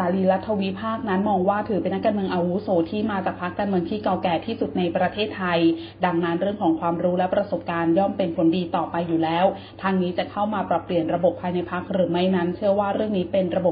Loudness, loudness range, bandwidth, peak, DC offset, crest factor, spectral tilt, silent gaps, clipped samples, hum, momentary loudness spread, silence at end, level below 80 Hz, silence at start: -23 LUFS; 1 LU; 5.2 kHz; -6 dBFS; under 0.1%; 16 dB; -11.5 dB/octave; none; under 0.1%; none; 5 LU; 0 s; -54 dBFS; 0 s